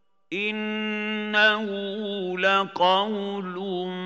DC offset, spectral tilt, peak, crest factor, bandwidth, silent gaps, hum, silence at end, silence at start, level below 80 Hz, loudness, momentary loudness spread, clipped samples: under 0.1%; -5 dB/octave; -6 dBFS; 18 dB; 7.8 kHz; none; none; 0 s; 0.3 s; -86 dBFS; -24 LUFS; 10 LU; under 0.1%